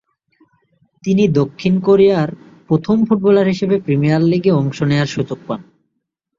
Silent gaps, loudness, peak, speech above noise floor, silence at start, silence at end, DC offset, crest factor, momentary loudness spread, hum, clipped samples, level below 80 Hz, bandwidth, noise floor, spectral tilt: none; -15 LUFS; -2 dBFS; 60 dB; 1.05 s; 0.75 s; under 0.1%; 14 dB; 11 LU; none; under 0.1%; -52 dBFS; 7.6 kHz; -74 dBFS; -8 dB/octave